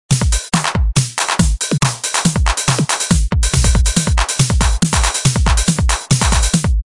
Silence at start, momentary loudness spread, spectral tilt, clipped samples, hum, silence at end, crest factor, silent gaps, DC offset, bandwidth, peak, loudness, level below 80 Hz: 0.1 s; 2 LU; -3.5 dB/octave; under 0.1%; none; 0.05 s; 14 dB; none; 0.1%; 11.5 kHz; 0 dBFS; -15 LUFS; -18 dBFS